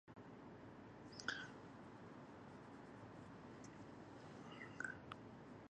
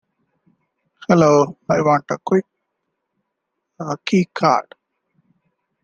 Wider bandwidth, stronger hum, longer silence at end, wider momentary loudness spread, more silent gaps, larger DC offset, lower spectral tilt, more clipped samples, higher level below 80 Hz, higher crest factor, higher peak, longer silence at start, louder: first, 9.6 kHz vs 7.4 kHz; neither; second, 0.05 s vs 1.2 s; second, 10 LU vs 13 LU; neither; neither; second, -4.5 dB/octave vs -6.5 dB/octave; neither; second, -78 dBFS vs -60 dBFS; first, 28 dB vs 20 dB; second, -28 dBFS vs 0 dBFS; second, 0.05 s vs 1.1 s; second, -55 LUFS vs -18 LUFS